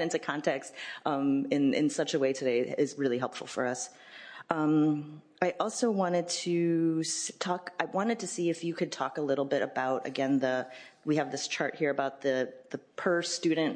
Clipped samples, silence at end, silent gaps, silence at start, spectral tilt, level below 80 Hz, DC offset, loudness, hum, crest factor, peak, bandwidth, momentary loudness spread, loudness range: under 0.1%; 0 s; none; 0 s; -4.5 dB/octave; -84 dBFS; under 0.1%; -31 LUFS; none; 22 dB; -8 dBFS; 10.5 kHz; 8 LU; 2 LU